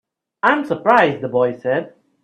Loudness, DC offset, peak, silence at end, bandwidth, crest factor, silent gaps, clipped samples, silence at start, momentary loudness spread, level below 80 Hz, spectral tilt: -17 LUFS; under 0.1%; 0 dBFS; 0.35 s; 8.6 kHz; 18 dB; none; under 0.1%; 0.45 s; 8 LU; -62 dBFS; -7 dB/octave